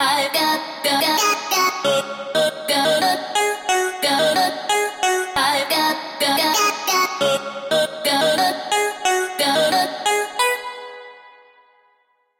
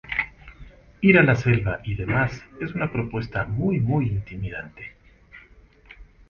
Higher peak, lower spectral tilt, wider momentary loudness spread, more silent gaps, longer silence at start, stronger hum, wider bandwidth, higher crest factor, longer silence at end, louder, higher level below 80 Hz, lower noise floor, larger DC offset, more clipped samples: about the same, -6 dBFS vs -4 dBFS; second, -1 dB/octave vs -8.5 dB/octave; second, 4 LU vs 18 LU; neither; about the same, 0 s vs 0.05 s; neither; first, 16.5 kHz vs 7 kHz; second, 14 dB vs 20 dB; first, 1.1 s vs 0.25 s; first, -19 LUFS vs -23 LUFS; second, -64 dBFS vs -44 dBFS; first, -63 dBFS vs -52 dBFS; neither; neither